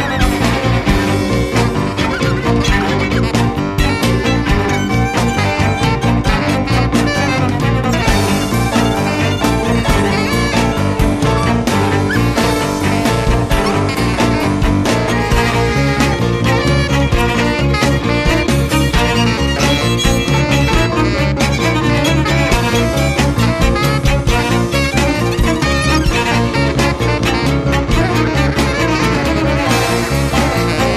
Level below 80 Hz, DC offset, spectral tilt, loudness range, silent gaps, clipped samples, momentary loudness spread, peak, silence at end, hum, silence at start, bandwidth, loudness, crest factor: -22 dBFS; under 0.1%; -5.5 dB/octave; 1 LU; none; under 0.1%; 2 LU; 0 dBFS; 0 s; none; 0 s; 14 kHz; -14 LUFS; 12 dB